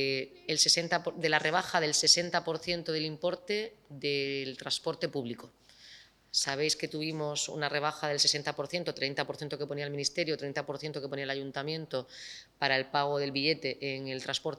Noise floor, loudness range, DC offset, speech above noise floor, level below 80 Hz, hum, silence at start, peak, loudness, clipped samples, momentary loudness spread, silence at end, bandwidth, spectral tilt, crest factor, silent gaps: -56 dBFS; 7 LU; under 0.1%; 24 dB; -72 dBFS; none; 0 s; -10 dBFS; -31 LUFS; under 0.1%; 12 LU; 0 s; 14.5 kHz; -2.5 dB/octave; 24 dB; none